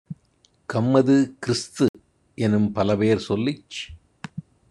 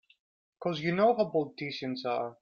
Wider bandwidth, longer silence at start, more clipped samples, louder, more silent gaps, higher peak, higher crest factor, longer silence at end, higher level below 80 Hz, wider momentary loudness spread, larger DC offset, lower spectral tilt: first, 11 kHz vs 7 kHz; second, 0.1 s vs 0.6 s; neither; first, -22 LUFS vs -31 LUFS; first, 1.89-1.94 s vs none; first, -4 dBFS vs -14 dBFS; about the same, 20 dB vs 16 dB; first, 0.3 s vs 0.1 s; first, -56 dBFS vs -74 dBFS; first, 21 LU vs 10 LU; neither; about the same, -6.5 dB/octave vs -7 dB/octave